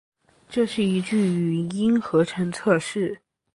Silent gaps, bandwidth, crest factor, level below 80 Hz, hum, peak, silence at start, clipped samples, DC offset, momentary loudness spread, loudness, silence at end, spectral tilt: none; 11.5 kHz; 20 dB; -62 dBFS; none; -4 dBFS; 0.5 s; under 0.1%; under 0.1%; 7 LU; -23 LUFS; 0.35 s; -6.5 dB/octave